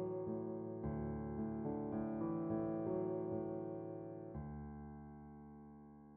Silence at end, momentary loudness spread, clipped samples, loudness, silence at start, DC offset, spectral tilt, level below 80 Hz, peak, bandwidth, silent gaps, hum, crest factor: 0 s; 15 LU; under 0.1%; -44 LUFS; 0 s; under 0.1%; -8 dB/octave; -62 dBFS; -28 dBFS; 2.6 kHz; none; none; 16 dB